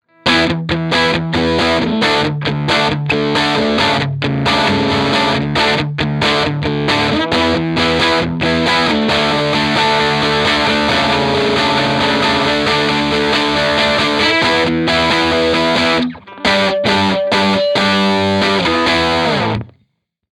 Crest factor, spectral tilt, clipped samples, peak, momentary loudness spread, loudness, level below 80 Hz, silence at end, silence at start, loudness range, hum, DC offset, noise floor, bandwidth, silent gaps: 14 dB; -4.5 dB/octave; under 0.1%; 0 dBFS; 3 LU; -13 LUFS; -38 dBFS; 0.65 s; 0.25 s; 1 LU; none; under 0.1%; -64 dBFS; 15.5 kHz; none